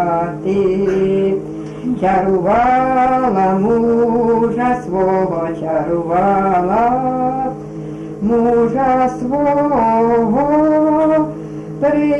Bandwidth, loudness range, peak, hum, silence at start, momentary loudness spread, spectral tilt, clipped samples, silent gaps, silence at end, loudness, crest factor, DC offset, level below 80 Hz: 9.8 kHz; 2 LU; -6 dBFS; none; 0 s; 9 LU; -8.5 dB/octave; under 0.1%; none; 0 s; -15 LUFS; 10 dB; under 0.1%; -42 dBFS